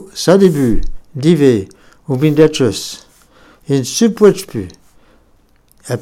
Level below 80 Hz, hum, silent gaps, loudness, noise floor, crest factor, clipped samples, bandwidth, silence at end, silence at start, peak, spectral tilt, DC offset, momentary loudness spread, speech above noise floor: -28 dBFS; none; none; -13 LUFS; -51 dBFS; 14 dB; 0.2%; 16 kHz; 0 s; 0 s; 0 dBFS; -6 dB/octave; under 0.1%; 16 LU; 39 dB